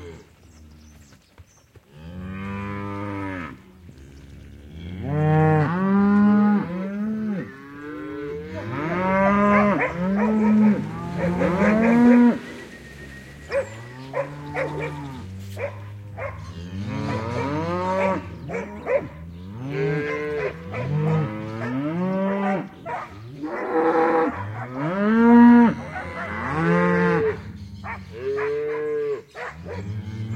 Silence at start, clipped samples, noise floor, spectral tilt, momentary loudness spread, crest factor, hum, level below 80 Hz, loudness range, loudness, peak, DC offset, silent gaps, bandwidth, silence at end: 0 s; under 0.1%; -53 dBFS; -8.5 dB/octave; 19 LU; 18 dB; none; -52 dBFS; 13 LU; -22 LUFS; -4 dBFS; under 0.1%; none; 8.6 kHz; 0 s